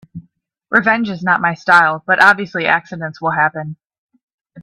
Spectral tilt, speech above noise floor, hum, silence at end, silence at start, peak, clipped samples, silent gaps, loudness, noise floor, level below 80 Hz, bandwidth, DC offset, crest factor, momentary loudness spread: -5.5 dB/octave; 43 dB; none; 0 s; 0.15 s; 0 dBFS; under 0.1%; 3.98-4.09 s, 4.23-4.28 s, 4.34-4.38 s; -14 LUFS; -58 dBFS; -60 dBFS; 13.5 kHz; under 0.1%; 16 dB; 11 LU